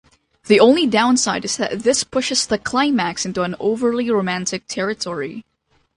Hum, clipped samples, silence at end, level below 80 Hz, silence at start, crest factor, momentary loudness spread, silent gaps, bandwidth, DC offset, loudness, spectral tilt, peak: none; under 0.1%; 0.55 s; -54 dBFS; 0.45 s; 18 dB; 11 LU; none; 11.5 kHz; under 0.1%; -18 LUFS; -3.5 dB/octave; 0 dBFS